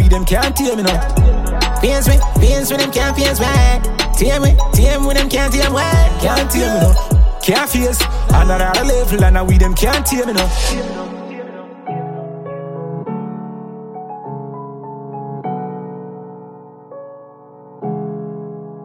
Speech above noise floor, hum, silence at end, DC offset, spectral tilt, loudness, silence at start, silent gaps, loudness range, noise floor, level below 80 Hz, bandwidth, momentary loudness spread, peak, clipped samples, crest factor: 28 dB; none; 0 s; under 0.1%; -4.5 dB/octave; -15 LUFS; 0 s; none; 15 LU; -40 dBFS; -16 dBFS; 16.5 kHz; 17 LU; 0 dBFS; under 0.1%; 14 dB